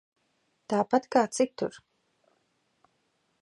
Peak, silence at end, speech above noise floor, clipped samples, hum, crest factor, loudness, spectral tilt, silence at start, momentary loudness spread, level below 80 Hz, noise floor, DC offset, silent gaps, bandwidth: -10 dBFS; 1.65 s; 47 dB; under 0.1%; none; 22 dB; -28 LUFS; -4.5 dB/octave; 0.7 s; 10 LU; -76 dBFS; -74 dBFS; under 0.1%; none; 11.5 kHz